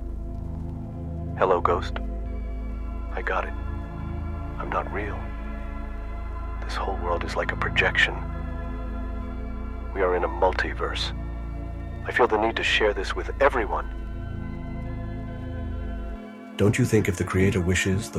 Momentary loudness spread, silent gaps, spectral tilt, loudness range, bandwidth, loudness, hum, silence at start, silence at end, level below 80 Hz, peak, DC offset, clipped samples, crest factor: 13 LU; none; -5.5 dB/octave; 6 LU; 13.5 kHz; -27 LUFS; none; 0 s; 0 s; -34 dBFS; -6 dBFS; under 0.1%; under 0.1%; 22 dB